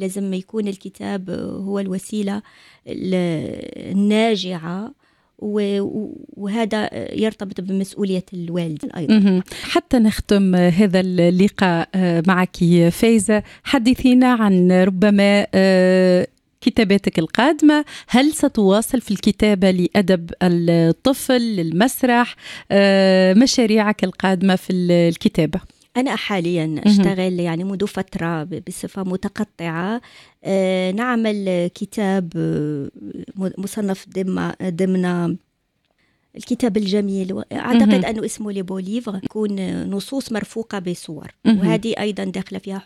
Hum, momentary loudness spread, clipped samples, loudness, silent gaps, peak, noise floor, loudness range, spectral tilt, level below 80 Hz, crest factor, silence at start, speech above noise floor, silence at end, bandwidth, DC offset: none; 13 LU; under 0.1%; -18 LUFS; none; -2 dBFS; -68 dBFS; 8 LU; -6 dB/octave; -48 dBFS; 16 dB; 0 s; 50 dB; 0.05 s; 14.5 kHz; under 0.1%